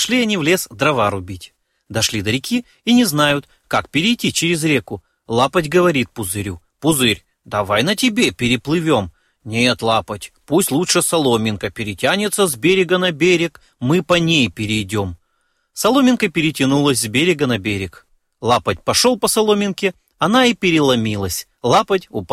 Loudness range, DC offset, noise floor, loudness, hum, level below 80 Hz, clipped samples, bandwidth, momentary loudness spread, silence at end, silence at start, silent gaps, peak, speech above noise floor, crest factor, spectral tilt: 2 LU; under 0.1%; -66 dBFS; -17 LUFS; none; -48 dBFS; under 0.1%; 16 kHz; 10 LU; 0 s; 0 s; none; 0 dBFS; 49 dB; 18 dB; -4 dB/octave